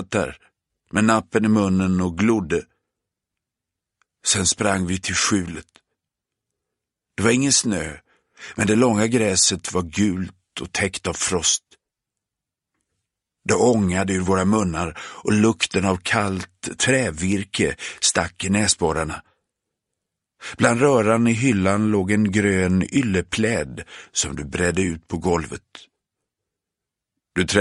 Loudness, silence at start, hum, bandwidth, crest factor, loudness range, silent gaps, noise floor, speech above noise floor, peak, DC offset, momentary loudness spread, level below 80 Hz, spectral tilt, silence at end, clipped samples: -20 LUFS; 0 s; none; 11.5 kHz; 22 dB; 5 LU; none; -85 dBFS; 65 dB; 0 dBFS; under 0.1%; 12 LU; -48 dBFS; -4 dB/octave; 0 s; under 0.1%